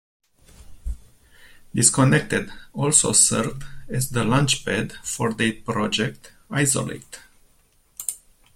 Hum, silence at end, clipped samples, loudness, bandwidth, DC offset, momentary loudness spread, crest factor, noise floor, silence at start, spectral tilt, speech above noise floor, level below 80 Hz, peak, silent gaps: none; 0.4 s; under 0.1%; -21 LUFS; 16.5 kHz; under 0.1%; 22 LU; 24 dB; -60 dBFS; 0.7 s; -3.5 dB/octave; 38 dB; -44 dBFS; 0 dBFS; none